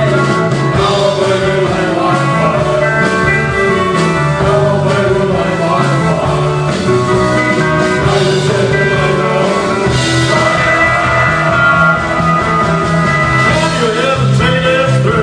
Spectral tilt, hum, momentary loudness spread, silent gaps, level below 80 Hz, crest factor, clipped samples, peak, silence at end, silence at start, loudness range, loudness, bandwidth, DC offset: -5.5 dB/octave; none; 3 LU; none; -32 dBFS; 10 dB; under 0.1%; 0 dBFS; 0 s; 0 s; 2 LU; -11 LUFS; 10 kHz; under 0.1%